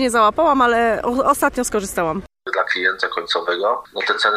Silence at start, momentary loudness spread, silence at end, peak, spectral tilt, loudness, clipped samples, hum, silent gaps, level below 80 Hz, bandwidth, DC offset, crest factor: 0 s; 8 LU; 0 s; -2 dBFS; -3 dB/octave; -18 LUFS; under 0.1%; none; none; -46 dBFS; 15.5 kHz; under 0.1%; 16 dB